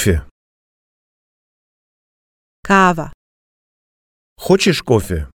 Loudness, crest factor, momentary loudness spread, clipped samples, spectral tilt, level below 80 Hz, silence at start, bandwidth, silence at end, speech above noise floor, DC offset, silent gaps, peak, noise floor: -15 LUFS; 20 dB; 18 LU; under 0.1%; -5 dB/octave; -34 dBFS; 0 s; 17 kHz; 0.1 s; over 76 dB; under 0.1%; 0.31-2.63 s, 3.14-4.36 s; 0 dBFS; under -90 dBFS